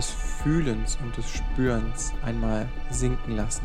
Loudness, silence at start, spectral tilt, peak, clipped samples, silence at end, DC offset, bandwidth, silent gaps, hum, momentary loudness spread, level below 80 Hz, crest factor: -29 LUFS; 0 s; -5 dB/octave; -12 dBFS; under 0.1%; 0 s; under 0.1%; 12 kHz; none; none; 6 LU; -28 dBFS; 14 dB